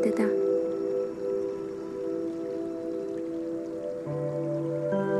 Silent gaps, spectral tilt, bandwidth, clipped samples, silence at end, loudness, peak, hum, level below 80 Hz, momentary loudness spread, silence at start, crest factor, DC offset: none; -8 dB/octave; 12 kHz; under 0.1%; 0 s; -31 LUFS; -12 dBFS; none; -66 dBFS; 8 LU; 0 s; 16 dB; under 0.1%